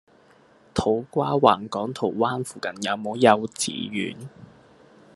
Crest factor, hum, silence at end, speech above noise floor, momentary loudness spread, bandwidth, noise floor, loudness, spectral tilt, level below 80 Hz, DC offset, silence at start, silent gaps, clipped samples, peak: 24 dB; none; 0.7 s; 32 dB; 12 LU; 12.5 kHz; -56 dBFS; -24 LUFS; -4.5 dB/octave; -58 dBFS; under 0.1%; 0.75 s; none; under 0.1%; 0 dBFS